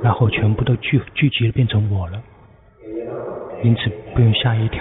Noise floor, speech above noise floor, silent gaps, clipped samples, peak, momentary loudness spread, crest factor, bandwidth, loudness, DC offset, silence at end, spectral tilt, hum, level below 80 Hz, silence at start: -47 dBFS; 30 dB; none; under 0.1%; -4 dBFS; 13 LU; 14 dB; 4 kHz; -19 LUFS; under 0.1%; 0 s; -5.5 dB/octave; none; -40 dBFS; 0 s